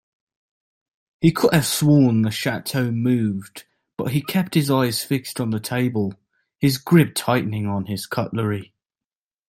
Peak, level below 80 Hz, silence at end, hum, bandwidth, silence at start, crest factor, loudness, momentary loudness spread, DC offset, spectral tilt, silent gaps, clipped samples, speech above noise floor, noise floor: -2 dBFS; -56 dBFS; 0.85 s; none; 16.5 kHz; 1.2 s; 18 dB; -21 LUFS; 10 LU; under 0.1%; -5.5 dB/octave; none; under 0.1%; over 70 dB; under -90 dBFS